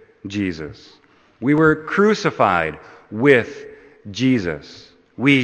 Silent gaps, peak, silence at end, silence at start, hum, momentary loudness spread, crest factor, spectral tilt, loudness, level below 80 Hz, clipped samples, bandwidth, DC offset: none; 0 dBFS; 0 s; 0.25 s; none; 18 LU; 20 dB; -6.5 dB/octave; -18 LUFS; -52 dBFS; under 0.1%; 8.8 kHz; under 0.1%